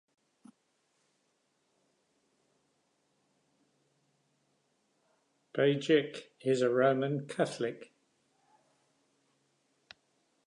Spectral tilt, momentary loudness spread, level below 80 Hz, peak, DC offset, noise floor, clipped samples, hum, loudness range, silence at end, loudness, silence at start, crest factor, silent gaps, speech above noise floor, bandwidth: -6 dB/octave; 13 LU; -88 dBFS; -14 dBFS; under 0.1%; -77 dBFS; under 0.1%; none; 9 LU; 2.65 s; -31 LUFS; 5.55 s; 22 dB; none; 47 dB; 11 kHz